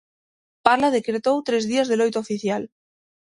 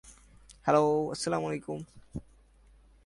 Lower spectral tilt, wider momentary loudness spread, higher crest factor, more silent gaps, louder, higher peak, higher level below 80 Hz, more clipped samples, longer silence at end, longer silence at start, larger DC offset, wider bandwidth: about the same, -4.5 dB/octave vs -5.5 dB/octave; second, 8 LU vs 20 LU; about the same, 22 dB vs 22 dB; neither; first, -22 LUFS vs -30 LUFS; first, 0 dBFS vs -10 dBFS; second, -64 dBFS vs -58 dBFS; neither; second, 0.65 s vs 0.85 s; first, 0.65 s vs 0.05 s; neither; about the same, 11.5 kHz vs 11.5 kHz